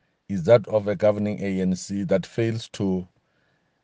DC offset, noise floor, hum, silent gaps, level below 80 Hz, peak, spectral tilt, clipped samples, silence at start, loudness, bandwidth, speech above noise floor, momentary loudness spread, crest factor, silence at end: under 0.1%; -68 dBFS; none; none; -64 dBFS; -4 dBFS; -7 dB/octave; under 0.1%; 0.3 s; -24 LUFS; 9.6 kHz; 45 dB; 9 LU; 20 dB; 0.8 s